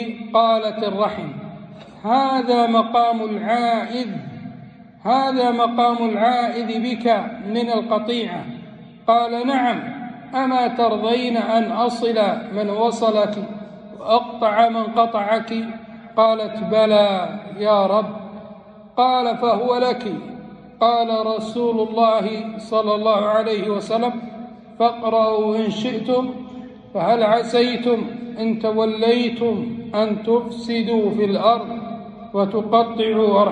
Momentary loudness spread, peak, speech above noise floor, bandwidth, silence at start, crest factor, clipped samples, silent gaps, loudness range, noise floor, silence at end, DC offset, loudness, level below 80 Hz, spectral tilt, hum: 14 LU; -4 dBFS; 23 dB; 9.4 kHz; 0 s; 16 dB; under 0.1%; none; 2 LU; -41 dBFS; 0 s; under 0.1%; -19 LUFS; -62 dBFS; -6 dB/octave; none